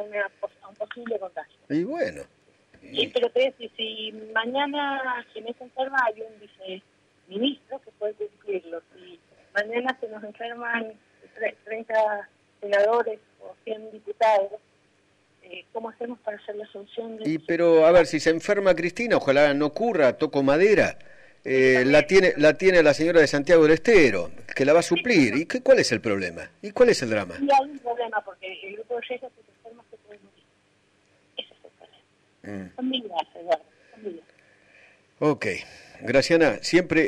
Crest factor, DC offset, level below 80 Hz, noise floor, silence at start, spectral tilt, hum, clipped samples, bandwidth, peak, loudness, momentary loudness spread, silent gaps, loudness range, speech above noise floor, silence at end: 16 dB; under 0.1%; -56 dBFS; -64 dBFS; 0 s; -5 dB/octave; 50 Hz at -65 dBFS; under 0.1%; 10.5 kHz; -8 dBFS; -23 LUFS; 20 LU; none; 14 LU; 41 dB; 0 s